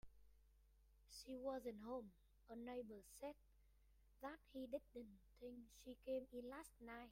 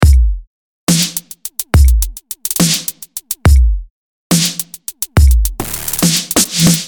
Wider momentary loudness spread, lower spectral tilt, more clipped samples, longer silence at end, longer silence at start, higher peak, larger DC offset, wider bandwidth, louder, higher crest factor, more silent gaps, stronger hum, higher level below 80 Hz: about the same, 11 LU vs 12 LU; about the same, -4.5 dB/octave vs -4 dB/octave; neither; about the same, 0 s vs 0 s; about the same, 0.05 s vs 0 s; second, -36 dBFS vs 0 dBFS; neither; second, 16 kHz vs 19.5 kHz; second, -55 LUFS vs -14 LUFS; first, 18 dB vs 12 dB; second, none vs 0.47-0.87 s, 3.90-4.30 s; neither; second, -74 dBFS vs -14 dBFS